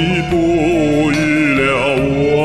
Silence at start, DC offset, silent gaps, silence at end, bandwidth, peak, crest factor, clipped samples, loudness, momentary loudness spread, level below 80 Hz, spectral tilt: 0 s; 0.7%; none; 0 s; 13 kHz; -2 dBFS; 12 dB; under 0.1%; -14 LUFS; 2 LU; -34 dBFS; -6 dB/octave